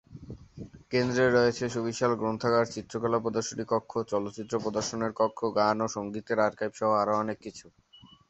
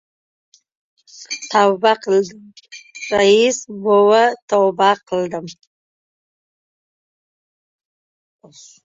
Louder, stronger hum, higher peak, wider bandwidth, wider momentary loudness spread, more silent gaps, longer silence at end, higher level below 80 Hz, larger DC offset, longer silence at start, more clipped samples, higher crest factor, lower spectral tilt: second, -29 LUFS vs -16 LUFS; neither; second, -10 dBFS vs -2 dBFS; about the same, 8.2 kHz vs 7.8 kHz; about the same, 17 LU vs 16 LU; second, none vs 4.42-4.48 s; second, 0.6 s vs 3.35 s; about the same, -60 dBFS vs -64 dBFS; neither; second, 0.1 s vs 1.2 s; neither; about the same, 18 dB vs 18 dB; first, -5 dB/octave vs -3.5 dB/octave